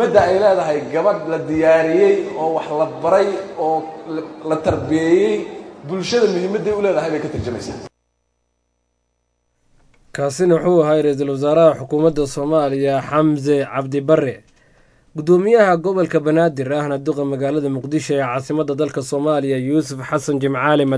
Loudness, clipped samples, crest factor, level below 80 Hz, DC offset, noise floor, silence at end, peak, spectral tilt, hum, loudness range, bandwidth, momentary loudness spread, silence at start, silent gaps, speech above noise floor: -17 LUFS; under 0.1%; 16 dB; -50 dBFS; under 0.1%; -69 dBFS; 0 s; 0 dBFS; -6.5 dB/octave; 60 Hz at -60 dBFS; 5 LU; 11 kHz; 11 LU; 0 s; none; 52 dB